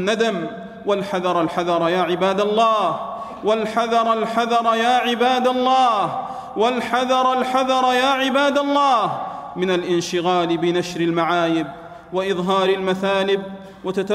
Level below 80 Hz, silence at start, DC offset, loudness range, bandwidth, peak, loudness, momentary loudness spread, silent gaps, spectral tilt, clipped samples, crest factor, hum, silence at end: -58 dBFS; 0 s; under 0.1%; 2 LU; 14 kHz; -4 dBFS; -19 LUFS; 10 LU; none; -5 dB/octave; under 0.1%; 14 dB; none; 0 s